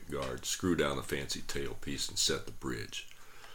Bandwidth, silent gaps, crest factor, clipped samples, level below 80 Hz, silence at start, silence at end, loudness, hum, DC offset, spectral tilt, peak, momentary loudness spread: 19 kHz; none; 20 dB; under 0.1%; -50 dBFS; 0 s; 0 s; -35 LUFS; none; 0.3%; -3 dB/octave; -16 dBFS; 11 LU